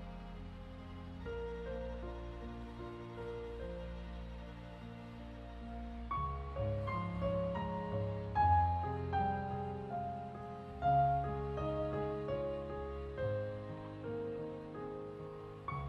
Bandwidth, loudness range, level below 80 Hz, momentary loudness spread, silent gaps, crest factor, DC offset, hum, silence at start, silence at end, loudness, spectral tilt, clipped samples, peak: 7.8 kHz; 11 LU; -50 dBFS; 16 LU; none; 20 dB; under 0.1%; none; 0 s; 0 s; -40 LUFS; -9 dB/octave; under 0.1%; -20 dBFS